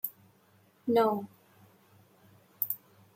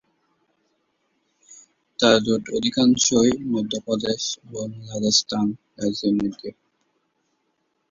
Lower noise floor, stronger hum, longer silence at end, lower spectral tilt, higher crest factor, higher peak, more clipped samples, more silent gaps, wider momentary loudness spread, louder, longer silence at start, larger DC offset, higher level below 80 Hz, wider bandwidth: second, -65 dBFS vs -72 dBFS; neither; second, 0.4 s vs 1.4 s; first, -6 dB/octave vs -3.5 dB/octave; about the same, 24 dB vs 22 dB; second, -10 dBFS vs -2 dBFS; neither; neither; about the same, 13 LU vs 14 LU; second, -31 LUFS vs -21 LUFS; second, 0.05 s vs 1.5 s; neither; second, -82 dBFS vs -58 dBFS; first, 16.5 kHz vs 7.8 kHz